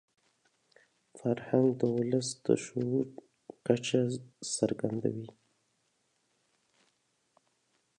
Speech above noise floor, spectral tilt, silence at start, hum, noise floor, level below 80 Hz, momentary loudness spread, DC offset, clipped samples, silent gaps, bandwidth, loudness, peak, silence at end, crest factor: 45 dB; -5.5 dB/octave; 1.15 s; none; -76 dBFS; -74 dBFS; 11 LU; under 0.1%; under 0.1%; none; 11 kHz; -32 LUFS; -10 dBFS; 2.7 s; 24 dB